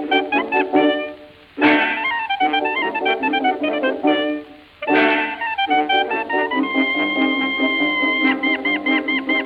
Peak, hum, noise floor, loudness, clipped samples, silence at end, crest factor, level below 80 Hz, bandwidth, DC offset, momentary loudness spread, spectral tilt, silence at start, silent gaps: -2 dBFS; none; -39 dBFS; -18 LUFS; under 0.1%; 0 s; 16 dB; -62 dBFS; 5.2 kHz; under 0.1%; 4 LU; -5.5 dB/octave; 0 s; none